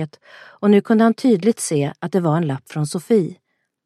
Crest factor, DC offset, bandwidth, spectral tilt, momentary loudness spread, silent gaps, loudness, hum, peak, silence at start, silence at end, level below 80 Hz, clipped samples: 16 dB; under 0.1%; 13 kHz; -6.5 dB/octave; 10 LU; none; -18 LUFS; none; -2 dBFS; 0 s; 0.5 s; -68 dBFS; under 0.1%